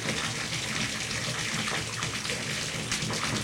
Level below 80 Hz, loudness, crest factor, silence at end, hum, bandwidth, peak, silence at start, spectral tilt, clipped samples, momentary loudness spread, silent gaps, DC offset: -54 dBFS; -30 LUFS; 18 dB; 0 s; none; 16.5 kHz; -14 dBFS; 0 s; -2.5 dB/octave; under 0.1%; 2 LU; none; under 0.1%